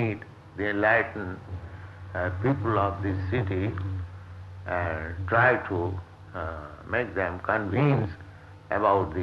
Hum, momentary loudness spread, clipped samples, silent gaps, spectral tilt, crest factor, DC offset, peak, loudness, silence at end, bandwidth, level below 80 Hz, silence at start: none; 18 LU; under 0.1%; none; -9 dB/octave; 18 dB; under 0.1%; -8 dBFS; -27 LUFS; 0 s; 6.2 kHz; -50 dBFS; 0 s